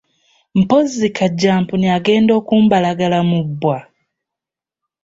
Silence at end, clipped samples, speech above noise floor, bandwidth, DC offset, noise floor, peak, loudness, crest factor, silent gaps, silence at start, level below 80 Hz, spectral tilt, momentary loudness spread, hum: 1.2 s; under 0.1%; 72 dB; 7.8 kHz; under 0.1%; -86 dBFS; -2 dBFS; -15 LUFS; 14 dB; none; 0.55 s; -54 dBFS; -6.5 dB/octave; 7 LU; none